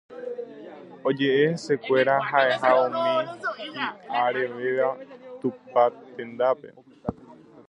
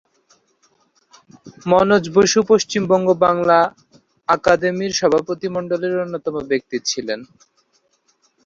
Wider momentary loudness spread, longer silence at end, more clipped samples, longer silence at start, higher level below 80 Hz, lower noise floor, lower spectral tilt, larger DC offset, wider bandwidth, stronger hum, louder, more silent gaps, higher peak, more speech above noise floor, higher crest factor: first, 16 LU vs 10 LU; second, 0.35 s vs 1.2 s; neither; second, 0.1 s vs 1.45 s; second, -64 dBFS vs -56 dBFS; second, -49 dBFS vs -63 dBFS; about the same, -5.5 dB/octave vs -4.5 dB/octave; neither; first, 10 kHz vs 7.8 kHz; neither; second, -24 LUFS vs -17 LUFS; neither; second, -6 dBFS vs 0 dBFS; second, 25 dB vs 46 dB; about the same, 20 dB vs 18 dB